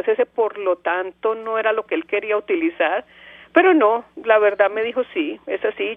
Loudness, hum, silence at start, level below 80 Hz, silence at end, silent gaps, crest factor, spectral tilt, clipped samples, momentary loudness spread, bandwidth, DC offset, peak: -20 LUFS; none; 0.05 s; -66 dBFS; 0 s; none; 20 dB; -6.5 dB/octave; under 0.1%; 9 LU; 3.8 kHz; under 0.1%; 0 dBFS